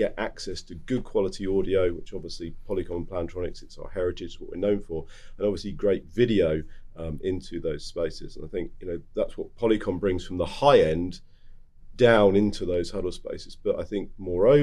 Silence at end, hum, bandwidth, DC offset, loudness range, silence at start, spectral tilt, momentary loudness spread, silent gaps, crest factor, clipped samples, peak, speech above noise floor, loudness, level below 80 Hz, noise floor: 0 s; none; 11 kHz; under 0.1%; 8 LU; 0 s; -6.5 dB/octave; 17 LU; none; 20 dB; under 0.1%; -6 dBFS; 20 dB; -27 LUFS; -42 dBFS; -46 dBFS